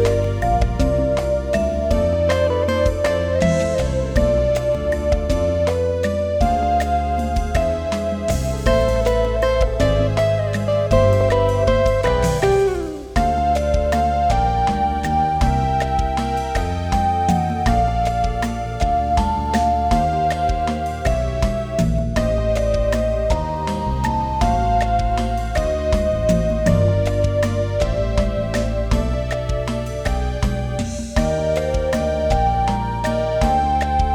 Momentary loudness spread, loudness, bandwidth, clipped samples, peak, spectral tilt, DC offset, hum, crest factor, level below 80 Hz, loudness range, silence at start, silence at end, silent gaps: 5 LU; -19 LUFS; 15.5 kHz; under 0.1%; -2 dBFS; -6.5 dB/octave; under 0.1%; none; 16 dB; -24 dBFS; 3 LU; 0 s; 0 s; none